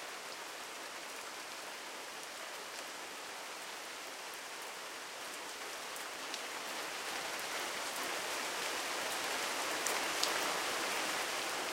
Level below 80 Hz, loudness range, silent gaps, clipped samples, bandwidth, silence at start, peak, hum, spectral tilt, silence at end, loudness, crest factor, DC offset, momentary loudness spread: -80 dBFS; 9 LU; none; under 0.1%; 16.5 kHz; 0 s; -10 dBFS; none; 0 dB/octave; 0 s; -39 LUFS; 30 dB; under 0.1%; 10 LU